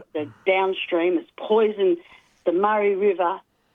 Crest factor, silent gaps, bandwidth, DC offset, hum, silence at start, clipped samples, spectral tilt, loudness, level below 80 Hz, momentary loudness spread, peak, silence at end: 16 dB; none; 3.9 kHz; under 0.1%; none; 0 s; under 0.1%; -7.5 dB/octave; -22 LUFS; -74 dBFS; 8 LU; -8 dBFS; 0.35 s